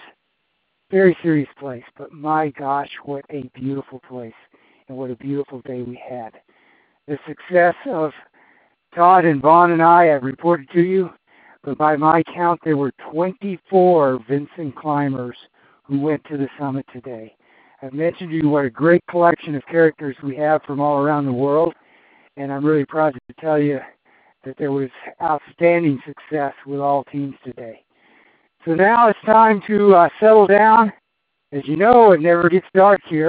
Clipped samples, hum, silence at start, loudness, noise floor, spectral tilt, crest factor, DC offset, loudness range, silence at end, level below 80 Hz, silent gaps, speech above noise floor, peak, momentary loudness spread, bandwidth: under 0.1%; none; 0.9 s; -17 LUFS; -73 dBFS; -6 dB/octave; 18 dB; under 0.1%; 12 LU; 0 s; -62 dBFS; none; 56 dB; 0 dBFS; 20 LU; 4.8 kHz